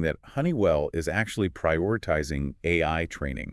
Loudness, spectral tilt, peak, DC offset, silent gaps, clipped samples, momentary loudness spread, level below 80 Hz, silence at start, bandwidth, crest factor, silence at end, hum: -27 LUFS; -6.5 dB/octave; -10 dBFS; under 0.1%; none; under 0.1%; 6 LU; -42 dBFS; 0 s; 12 kHz; 18 dB; 0 s; none